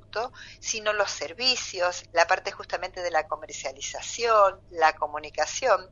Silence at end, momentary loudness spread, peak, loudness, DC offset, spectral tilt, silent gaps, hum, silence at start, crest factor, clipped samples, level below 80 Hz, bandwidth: 0.05 s; 11 LU; -4 dBFS; -26 LUFS; under 0.1%; -0.5 dB/octave; none; none; 0.15 s; 24 dB; under 0.1%; -56 dBFS; 7.8 kHz